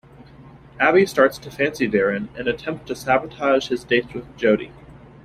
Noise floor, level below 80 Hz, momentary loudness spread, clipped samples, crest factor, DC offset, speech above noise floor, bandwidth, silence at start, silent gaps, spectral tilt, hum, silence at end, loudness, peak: -45 dBFS; -52 dBFS; 11 LU; under 0.1%; 20 dB; under 0.1%; 24 dB; 15.5 kHz; 0.4 s; none; -5.5 dB/octave; none; 0.3 s; -20 LUFS; -2 dBFS